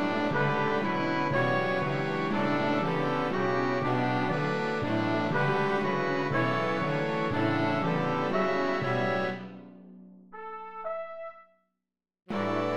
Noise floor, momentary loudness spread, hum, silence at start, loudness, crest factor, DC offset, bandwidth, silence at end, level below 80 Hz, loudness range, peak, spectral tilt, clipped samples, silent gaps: -88 dBFS; 11 LU; none; 0 s; -28 LUFS; 16 dB; 0.7%; 11 kHz; 0 s; -64 dBFS; 7 LU; -14 dBFS; -7 dB/octave; under 0.1%; none